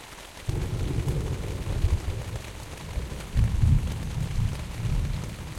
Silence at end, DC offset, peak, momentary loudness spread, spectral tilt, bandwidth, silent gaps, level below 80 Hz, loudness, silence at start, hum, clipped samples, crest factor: 0 s; under 0.1%; -10 dBFS; 12 LU; -6 dB/octave; 16 kHz; none; -32 dBFS; -30 LUFS; 0 s; none; under 0.1%; 18 dB